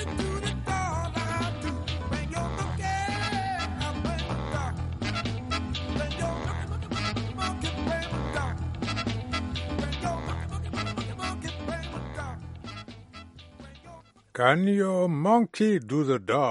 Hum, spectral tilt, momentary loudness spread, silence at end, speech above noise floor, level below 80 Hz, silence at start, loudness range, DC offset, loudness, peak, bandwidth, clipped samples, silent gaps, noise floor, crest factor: none; -5.5 dB/octave; 14 LU; 0 s; 27 dB; -40 dBFS; 0 s; 8 LU; under 0.1%; -29 LUFS; -6 dBFS; 11.5 kHz; under 0.1%; none; -50 dBFS; 24 dB